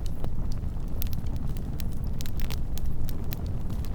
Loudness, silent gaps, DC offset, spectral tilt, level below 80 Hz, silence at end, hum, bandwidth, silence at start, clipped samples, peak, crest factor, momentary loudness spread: -34 LUFS; none; under 0.1%; -6.5 dB/octave; -30 dBFS; 0 s; none; over 20 kHz; 0 s; under 0.1%; -6 dBFS; 20 dB; 1 LU